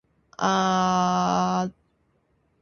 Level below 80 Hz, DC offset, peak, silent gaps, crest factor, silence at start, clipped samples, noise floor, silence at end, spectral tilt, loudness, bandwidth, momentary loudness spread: -58 dBFS; under 0.1%; -8 dBFS; none; 16 dB; 0.4 s; under 0.1%; -68 dBFS; 0.9 s; -5 dB/octave; -23 LUFS; 7 kHz; 6 LU